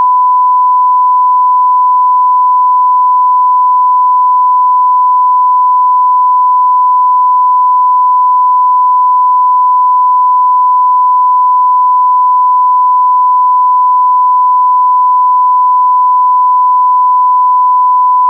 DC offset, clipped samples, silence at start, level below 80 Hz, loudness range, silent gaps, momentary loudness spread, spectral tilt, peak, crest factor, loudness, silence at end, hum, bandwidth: under 0.1%; under 0.1%; 0 s; under -90 dBFS; 0 LU; none; 0 LU; -4 dB/octave; -4 dBFS; 4 dB; -7 LUFS; 0 s; none; 1.1 kHz